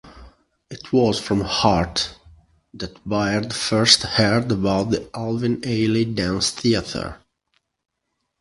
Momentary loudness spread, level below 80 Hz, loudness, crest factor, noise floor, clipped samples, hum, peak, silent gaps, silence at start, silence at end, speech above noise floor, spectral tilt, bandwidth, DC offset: 15 LU; -44 dBFS; -20 LUFS; 22 dB; -76 dBFS; under 0.1%; none; 0 dBFS; none; 0.05 s; 1.25 s; 56 dB; -4.5 dB/octave; 11.5 kHz; under 0.1%